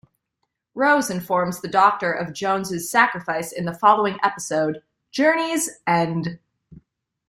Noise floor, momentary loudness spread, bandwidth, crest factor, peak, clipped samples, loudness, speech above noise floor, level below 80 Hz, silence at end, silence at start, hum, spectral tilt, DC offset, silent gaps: -77 dBFS; 9 LU; 16 kHz; 20 dB; -2 dBFS; under 0.1%; -21 LUFS; 56 dB; -64 dBFS; 0.55 s; 0.75 s; none; -4 dB/octave; under 0.1%; none